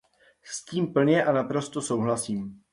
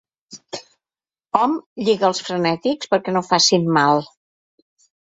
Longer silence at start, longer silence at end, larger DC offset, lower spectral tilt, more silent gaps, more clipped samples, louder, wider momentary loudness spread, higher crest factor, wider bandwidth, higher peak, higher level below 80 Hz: first, 0.45 s vs 0.3 s; second, 0.15 s vs 1 s; neither; first, -5.5 dB/octave vs -4 dB/octave; second, none vs 1.66-1.76 s; neither; second, -26 LUFS vs -18 LUFS; second, 12 LU vs 16 LU; about the same, 16 dB vs 20 dB; first, 11.5 kHz vs 8 kHz; second, -10 dBFS vs -2 dBFS; about the same, -66 dBFS vs -64 dBFS